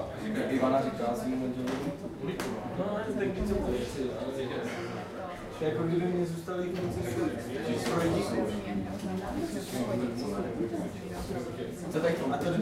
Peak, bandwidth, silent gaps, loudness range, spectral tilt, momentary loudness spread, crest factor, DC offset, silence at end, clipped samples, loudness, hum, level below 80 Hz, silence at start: -14 dBFS; 16 kHz; none; 2 LU; -6.5 dB/octave; 8 LU; 18 dB; under 0.1%; 0 s; under 0.1%; -33 LUFS; none; -50 dBFS; 0 s